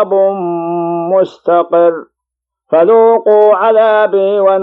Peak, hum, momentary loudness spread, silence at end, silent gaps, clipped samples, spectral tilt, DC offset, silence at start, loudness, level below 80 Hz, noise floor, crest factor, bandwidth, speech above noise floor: 0 dBFS; none; 8 LU; 0 s; none; under 0.1%; -8.5 dB/octave; under 0.1%; 0 s; -10 LUFS; -72 dBFS; -80 dBFS; 10 dB; 4.3 kHz; 71 dB